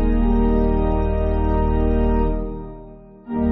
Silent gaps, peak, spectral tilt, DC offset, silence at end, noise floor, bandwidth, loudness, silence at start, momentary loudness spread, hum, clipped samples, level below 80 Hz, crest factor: none; -6 dBFS; -9 dB/octave; under 0.1%; 0 s; -40 dBFS; 3.9 kHz; -21 LUFS; 0 s; 15 LU; none; under 0.1%; -22 dBFS; 12 dB